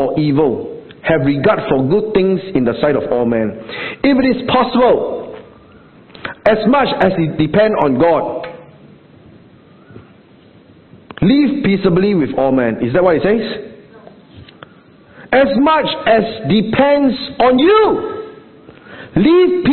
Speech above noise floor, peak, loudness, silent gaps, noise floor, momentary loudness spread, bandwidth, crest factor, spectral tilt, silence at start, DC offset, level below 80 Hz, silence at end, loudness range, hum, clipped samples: 32 dB; 0 dBFS; -14 LUFS; none; -44 dBFS; 13 LU; 4.5 kHz; 14 dB; -10 dB/octave; 0 s; under 0.1%; -44 dBFS; 0 s; 5 LU; none; under 0.1%